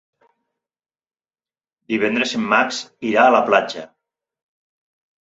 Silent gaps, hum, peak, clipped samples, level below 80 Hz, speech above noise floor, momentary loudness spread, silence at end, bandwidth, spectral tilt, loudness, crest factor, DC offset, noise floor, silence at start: none; none; -2 dBFS; under 0.1%; -68 dBFS; over 72 dB; 12 LU; 1.4 s; 8 kHz; -4 dB/octave; -17 LUFS; 20 dB; under 0.1%; under -90 dBFS; 1.9 s